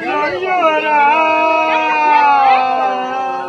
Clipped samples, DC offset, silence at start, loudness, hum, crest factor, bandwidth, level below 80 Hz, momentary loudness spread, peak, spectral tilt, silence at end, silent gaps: under 0.1%; under 0.1%; 0 s; -13 LUFS; none; 12 dB; 8 kHz; -62 dBFS; 7 LU; 0 dBFS; -3.5 dB/octave; 0 s; none